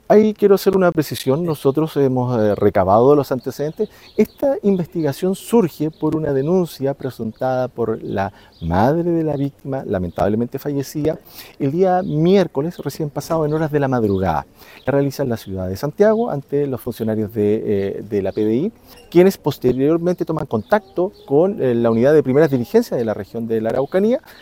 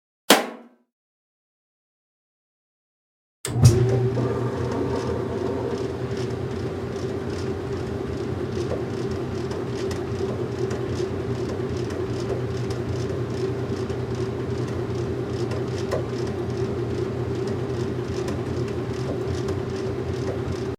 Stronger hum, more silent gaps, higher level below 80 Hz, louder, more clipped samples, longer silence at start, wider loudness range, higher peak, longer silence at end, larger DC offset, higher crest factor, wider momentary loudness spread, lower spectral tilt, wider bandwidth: neither; second, none vs 0.92-3.44 s; about the same, -48 dBFS vs -46 dBFS; first, -18 LUFS vs -26 LUFS; neither; second, 0.1 s vs 0.3 s; about the same, 4 LU vs 5 LU; about the same, 0 dBFS vs 0 dBFS; about the same, 0.1 s vs 0.05 s; neither; second, 18 dB vs 26 dB; first, 10 LU vs 7 LU; first, -7.5 dB/octave vs -6 dB/octave; about the same, 16.5 kHz vs 16 kHz